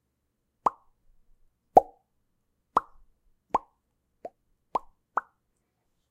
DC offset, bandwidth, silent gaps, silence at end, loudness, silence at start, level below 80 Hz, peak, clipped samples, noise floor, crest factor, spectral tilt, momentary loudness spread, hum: under 0.1%; 15.5 kHz; none; 0.9 s; -29 LUFS; 0.65 s; -62 dBFS; -4 dBFS; under 0.1%; -78 dBFS; 30 dB; -6 dB/octave; 25 LU; none